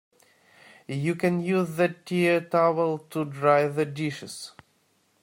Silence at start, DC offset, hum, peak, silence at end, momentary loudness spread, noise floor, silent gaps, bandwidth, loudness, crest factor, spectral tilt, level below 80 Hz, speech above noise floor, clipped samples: 0.9 s; under 0.1%; none; -6 dBFS; 0.7 s; 13 LU; -67 dBFS; none; 16 kHz; -25 LUFS; 20 dB; -6.5 dB/octave; -70 dBFS; 42 dB; under 0.1%